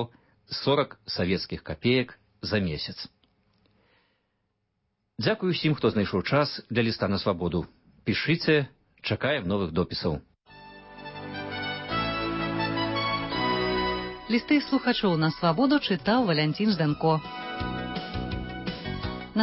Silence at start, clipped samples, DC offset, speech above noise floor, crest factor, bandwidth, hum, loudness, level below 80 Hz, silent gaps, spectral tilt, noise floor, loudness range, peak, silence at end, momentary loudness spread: 0 s; under 0.1%; under 0.1%; 51 dB; 18 dB; 5.8 kHz; none; -27 LUFS; -48 dBFS; none; -9.5 dB/octave; -77 dBFS; 6 LU; -10 dBFS; 0 s; 12 LU